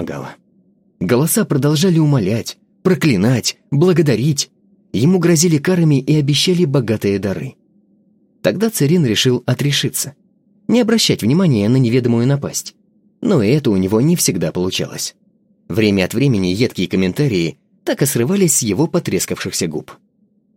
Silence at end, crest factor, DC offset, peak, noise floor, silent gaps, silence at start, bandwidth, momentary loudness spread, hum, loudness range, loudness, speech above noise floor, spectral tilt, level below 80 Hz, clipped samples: 0.65 s; 16 dB; under 0.1%; 0 dBFS; -58 dBFS; none; 0 s; 16.5 kHz; 10 LU; none; 3 LU; -16 LUFS; 43 dB; -5 dB/octave; -56 dBFS; under 0.1%